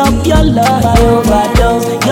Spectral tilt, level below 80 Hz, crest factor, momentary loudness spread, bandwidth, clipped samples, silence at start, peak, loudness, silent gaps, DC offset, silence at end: -6 dB/octave; -16 dBFS; 8 dB; 2 LU; 17.5 kHz; under 0.1%; 0 s; 0 dBFS; -10 LUFS; none; under 0.1%; 0 s